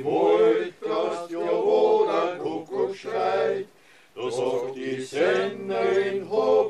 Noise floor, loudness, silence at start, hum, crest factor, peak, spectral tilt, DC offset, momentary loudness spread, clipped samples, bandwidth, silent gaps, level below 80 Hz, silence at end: -55 dBFS; -24 LUFS; 0 s; none; 14 dB; -10 dBFS; -5 dB/octave; under 0.1%; 10 LU; under 0.1%; 10.5 kHz; none; -72 dBFS; 0 s